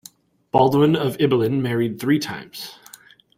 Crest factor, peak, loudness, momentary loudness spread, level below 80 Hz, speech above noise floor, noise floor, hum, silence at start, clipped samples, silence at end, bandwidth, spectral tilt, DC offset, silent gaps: 18 dB; -2 dBFS; -20 LUFS; 17 LU; -58 dBFS; 29 dB; -49 dBFS; none; 0.55 s; under 0.1%; 0.65 s; 16 kHz; -6.5 dB/octave; under 0.1%; none